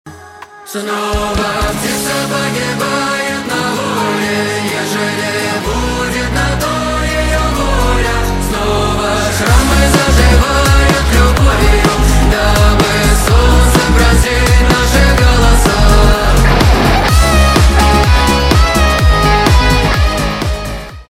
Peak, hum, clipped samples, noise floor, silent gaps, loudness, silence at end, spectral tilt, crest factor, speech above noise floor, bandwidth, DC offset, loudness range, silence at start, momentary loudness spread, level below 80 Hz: 0 dBFS; none; under 0.1%; -33 dBFS; none; -11 LUFS; 0.05 s; -4.5 dB/octave; 10 dB; 18 dB; 16 kHz; under 0.1%; 5 LU; 0.05 s; 6 LU; -14 dBFS